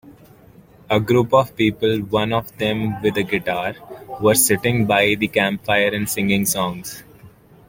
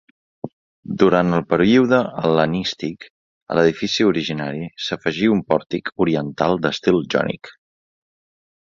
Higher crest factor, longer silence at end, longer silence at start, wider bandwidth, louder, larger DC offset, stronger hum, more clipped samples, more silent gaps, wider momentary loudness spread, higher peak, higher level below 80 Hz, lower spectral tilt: about the same, 18 dB vs 20 dB; second, 0.4 s vs 1.15 s; second, 0.05 s vs 0.45 s; first, 17 kHz vs 7.6 kHz; about the same, -19 LUFS vs -19 LUFS; neither; neither; neither; second, none vs 0.53-0.83 s, 3.10-3.46 s; second, 9 LU vs 14 LU; about the same, -2 dBFS vs 0 dBFS; about the same, -50 dBFS vs -54 dBFS; second, -4 dB/octave vs -6 dB/octave